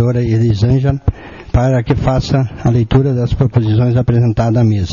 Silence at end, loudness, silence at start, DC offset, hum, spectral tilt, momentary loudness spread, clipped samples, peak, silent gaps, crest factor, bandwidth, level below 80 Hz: 0 s; -14 LUFS; 0 s; 0.2%; none; -8.5 dB/octave; 4 LU; under 0.1%; 0 dBFS; none; 12 dB; 7.2 kHz; -28 dBFS